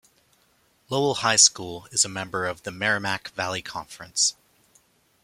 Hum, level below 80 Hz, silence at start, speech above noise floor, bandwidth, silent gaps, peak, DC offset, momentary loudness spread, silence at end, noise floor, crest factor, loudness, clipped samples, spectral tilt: none; -64 dBFS; 0.9 s; 39 dB; 16 kHz; none; -2 dBFS; under 0.1%; 15 LU; 0.9 s; -64 dBFS; 24 dB; -23 LUFS; under 0.1%; -1 dB/octave